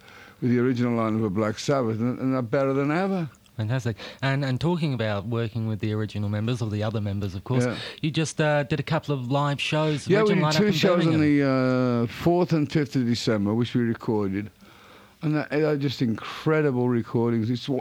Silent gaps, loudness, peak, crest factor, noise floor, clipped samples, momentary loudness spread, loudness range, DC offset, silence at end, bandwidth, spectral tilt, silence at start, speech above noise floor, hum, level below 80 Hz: none; -25 LUFS; -8 dBFS; 16 dB; -51 dBFS; under 0.1%; 8 LU; 5 LU; under 0.1%; 0 s; 16 kHz; -6.5 dB/octave; 0.1 s; 27 dB; none; -60 dBFS